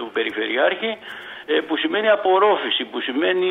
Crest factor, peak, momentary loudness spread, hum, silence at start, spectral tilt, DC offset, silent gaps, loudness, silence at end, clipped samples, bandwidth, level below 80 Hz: 16 dB; -4 dBFS; 10 LU; none; 0 s; -5 dB/octave; under 0.1%; none; -20 LUFS; 0 s; under 0.1%; 4.2 kHz; -72 dBFS